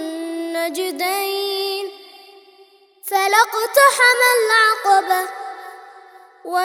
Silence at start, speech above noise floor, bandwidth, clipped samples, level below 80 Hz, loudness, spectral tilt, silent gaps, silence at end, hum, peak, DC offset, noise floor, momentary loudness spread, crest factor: 0 s; 34 dB; over 20 kHz; under 0.1%; -80 dBFS; -16 LUFS; 1.5 dB/octave; none; 0 s; none; 0 dBFS; under 0.1%; -51 dBFS; 20 LU; 18 dB